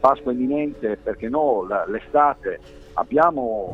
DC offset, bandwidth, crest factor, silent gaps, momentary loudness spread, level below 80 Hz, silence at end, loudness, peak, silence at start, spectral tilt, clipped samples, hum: under 0.1%; 7.6 kHz; 20 dB; none; 11 LU; -48 dBFS; 0 s; -22 LUFS; -2 dBFS; 0 s; -8 dB/octave; under 0.1%; none